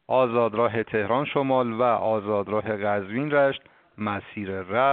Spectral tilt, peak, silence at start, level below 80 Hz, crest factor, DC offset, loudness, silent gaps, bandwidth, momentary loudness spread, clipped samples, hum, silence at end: -4.5 dB/octave; -8 dBFS; 0.1 s; -64 dBFS; 16 dB; under 0.1%; -25 LUFS; none; 4.4 kHz; 9 LU; under 0.1%; none; 0 s